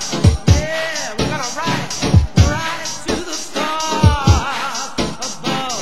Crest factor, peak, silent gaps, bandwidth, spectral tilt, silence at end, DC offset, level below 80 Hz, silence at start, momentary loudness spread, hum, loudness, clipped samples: 18 dB; 0 dBFS; none; 16 kHz; -4.5 dB/octave; 0 s; 3%; -24 dBFS; 0 s; 8 LU; none; -18 LUFS; under 0.1%